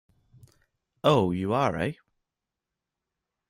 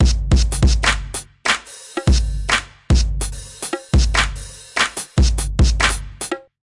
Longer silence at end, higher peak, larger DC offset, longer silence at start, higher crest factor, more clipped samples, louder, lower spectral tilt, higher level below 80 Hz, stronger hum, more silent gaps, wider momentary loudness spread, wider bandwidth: first, 1.55 s vs 0.25 s; second, -8 dBFS vs -4 dBFS; neither; first, 1.05 s vs 0 s; first, 22 dB vs 14 dB; neither; second, -26 LUFS vs -19 LUFS; first, -7 dB/octave vs -4 dB/octave; second, -60 dBFS vs -20 dBFS; neither; neither; about the same, 10 LU vs 11 LU; first, 16 kHz vs 11.5 kHz